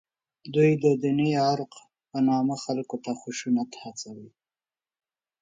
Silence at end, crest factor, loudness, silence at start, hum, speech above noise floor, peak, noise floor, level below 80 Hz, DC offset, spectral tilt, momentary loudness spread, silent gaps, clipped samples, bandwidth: 1.15 s; 18 dB; -26 LUFS; 0.45 s; none; over 65 dB; -10 dBFS; under -90 dBFS; -72 dBFS; under 0.1%; -6.5 dB/octave; 16 LU; none; under 0.1%; 9.2 kHz